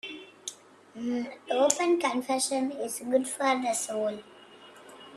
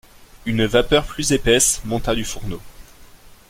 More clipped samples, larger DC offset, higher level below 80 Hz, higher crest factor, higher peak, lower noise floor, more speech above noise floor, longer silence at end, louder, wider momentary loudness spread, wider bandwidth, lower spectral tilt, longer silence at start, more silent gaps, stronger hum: neither; neither; second, -78 dBFS vs -34 dBFS; first, 26 dB vs 18 dB; about the same, -4 dBFS vs -2 dBFS; first, -51 dBFS vs -44 dBFS; about the same, 23 dB vs 25 dB; second, 0 s vs 0.15 s; second, -28 LUFS vs -18 LUFS; about the same, 16 LU vs 16 LU; second, 13.5 kHz vs 16.5 kHz; about the same, -2 dB/octave vs -3 dB/octave; second, 0.05 s vs 0.35 s; neither; neither